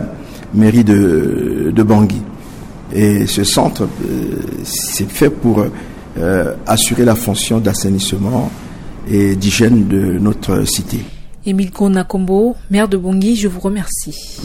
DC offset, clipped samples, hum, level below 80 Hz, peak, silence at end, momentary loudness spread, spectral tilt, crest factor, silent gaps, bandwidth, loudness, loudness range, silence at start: under 0.1%; under 0.1%; none; -32 dBFS; -2 dBFS; 0 s; 14 LU; -5 dB/octave; 12 dB; none; 17 kHz; -14 LUFS; 2 LU; 0 s